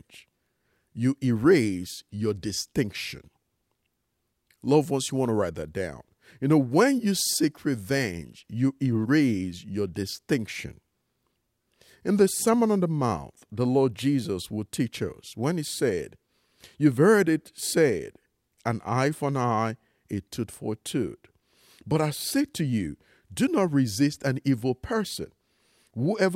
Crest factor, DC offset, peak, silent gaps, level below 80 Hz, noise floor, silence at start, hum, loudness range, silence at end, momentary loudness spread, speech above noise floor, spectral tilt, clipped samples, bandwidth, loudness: 20 dB; under 0.1%; -8 dBFS; none; -58 dBFS; -77 dBFS; 0.15 s; none; 5 LU; 0 s; 13 LU; 52 dB; -5.5 dB/octave; under 0.1%; 16 kHz; -26 LUFS